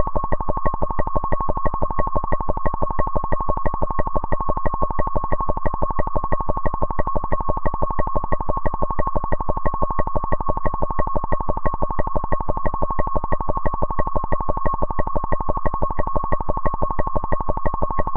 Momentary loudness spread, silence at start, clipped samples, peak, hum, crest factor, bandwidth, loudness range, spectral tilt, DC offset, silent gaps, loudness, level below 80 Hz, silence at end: 1 LU; 0 s; under 0.1%; -4 dBFS; none; 14 dB; 2.3 kHz; 0 LU; -12 dB/octave; under 0.1%; none; -25 LUFS; -24 dBFS; 0 s